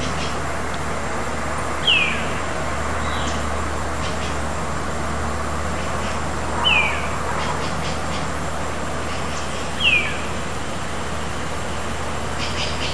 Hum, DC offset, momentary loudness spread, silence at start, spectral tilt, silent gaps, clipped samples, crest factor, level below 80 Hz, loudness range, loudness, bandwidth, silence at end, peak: none; 4%; 10 LU; 0 s; -3.5 dB/octave; none; under 0.1%; 18 dB; -34 dBFS; 3 LU; -23 LUFS; 11 kHz; 0 s; -4 dBFS